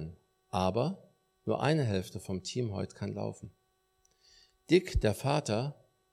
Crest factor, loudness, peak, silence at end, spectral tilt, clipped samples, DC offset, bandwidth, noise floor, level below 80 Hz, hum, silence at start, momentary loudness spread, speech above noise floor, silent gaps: 20 dB; -33 LUFS; -12 dBFS; 0.4 s; -6 dB/octave; under 0.1%; under 0.1%; 15 kHz; -73 dBFS; -48 dBFS; none; 0 s; 13 LU; 42 dB; none